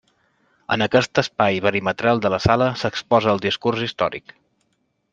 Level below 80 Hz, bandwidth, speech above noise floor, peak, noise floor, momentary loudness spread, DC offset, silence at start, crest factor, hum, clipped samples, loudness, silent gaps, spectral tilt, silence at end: -50 dBFS; 9.2 kHz; 50 dB; 0 dBFS; -69 dBFS; 7 LU; under 0.1%; 0.7 s; 20 dB; none; under 0.1%; -20 LUFS; none; -5.5 dB/octave; 0.95 s